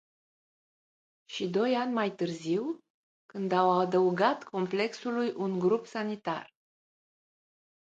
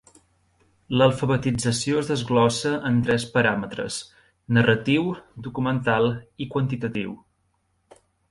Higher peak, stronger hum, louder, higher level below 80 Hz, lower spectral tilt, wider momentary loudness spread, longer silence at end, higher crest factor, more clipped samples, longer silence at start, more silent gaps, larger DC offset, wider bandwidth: second, -12 dBFS vs -4 dBFS; neither; second, -30 LUFS vs -23 LUFS; second, -80 dBFS vs -54 dBFS; about the same, -6 dB/octave vs -5.5 dB/octave; about the same, 11 LU vs 12 LU; first, 1.4 s vs 1.15 s; about the same, 20 dB vs 20 dB; neither; first, 1.3 s vs 0.9 s; first, 2.90-3.29 s vs none; neither; second, 7.8 kHz vs 11.5 kHz